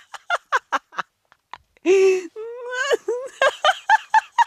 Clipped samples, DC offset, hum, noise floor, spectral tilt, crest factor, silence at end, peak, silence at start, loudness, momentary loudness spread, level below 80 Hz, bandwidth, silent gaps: under 0.1%; under 0.1%; none; -61 dBFS; -1 dB/octave; 16 dB; 0 s; -6 dBFS; 0.15 s; -20 LUFS; 15 LU; -72 dBFS; 12.5 kHz; none